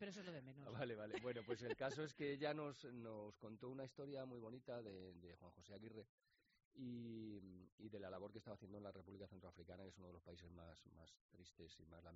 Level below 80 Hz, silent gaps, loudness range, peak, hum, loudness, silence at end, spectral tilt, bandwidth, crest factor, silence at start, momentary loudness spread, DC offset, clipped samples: -80 dBFS; 6.09-6.18 s, 6.65-6.71 s, 7.72-7.78 s, 11.21-11.29 s; 10 LU; -32 dBFS; none; -54 LUFS; 0 s; -5 dB/octave; 7.6 kHz; 22 dB; 0 s; 16 LU; under 0.1%; under 0.1%